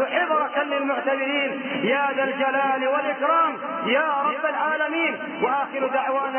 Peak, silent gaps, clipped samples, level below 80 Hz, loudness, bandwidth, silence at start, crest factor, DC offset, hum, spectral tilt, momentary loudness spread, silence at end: -8 dBFS; none; under 0.1%; -80 dBFS; -23 LUFS; 3.3 kHz; 0 s; 14 dB; under 0.1%; none; -8.5 dB/octave; 3 LU; 0 s